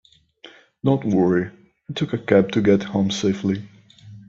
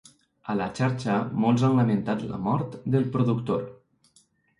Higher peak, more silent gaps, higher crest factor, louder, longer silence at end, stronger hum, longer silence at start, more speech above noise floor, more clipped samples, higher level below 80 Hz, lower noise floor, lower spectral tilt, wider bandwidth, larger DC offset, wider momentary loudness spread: first, 0 dBFS vs -10 dBFS; neither; about the same, 20 dB vs 16 dB; first, -21 LUFS vs -26 LUFS; second, 0.1 s vs 0.85 s; neither; about the same, 0.45 s vs 0.45 s; second, 29 dB vs 39 dB; neither; about the same, -56 dBFS vs -60 dBFS; second, -48 dBFS vs -63 dBFS; second, -6.5 dB/octave vs -8 dB/octave; second, 7.8 kHz vs 11 kHz; neither; about the same, 10 LU vs 9 LU